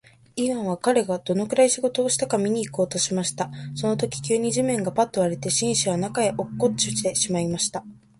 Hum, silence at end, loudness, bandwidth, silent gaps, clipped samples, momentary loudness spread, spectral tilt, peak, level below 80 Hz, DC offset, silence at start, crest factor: none; 0.25 s; -23 LUFS; 11.5 kHz; none; under 0.1%; 6 LU; -4 dB/octave; -6 dBFS; -58 dBFS; under 0.1%; 0.35 s; 18 dB